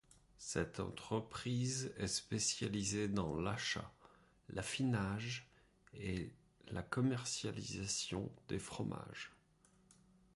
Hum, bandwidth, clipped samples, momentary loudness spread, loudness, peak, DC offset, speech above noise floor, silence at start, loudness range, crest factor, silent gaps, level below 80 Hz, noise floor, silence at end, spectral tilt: none; 11.5 kHz; under 0.1%; 11 LU; -41 LUFS; -24 dBFS; under 0.1%; 30 dB; 0.4 s; 3 LU; 20 dB; none; -62 dBFS; -71 dBFS; 1 s; -4 dB/octave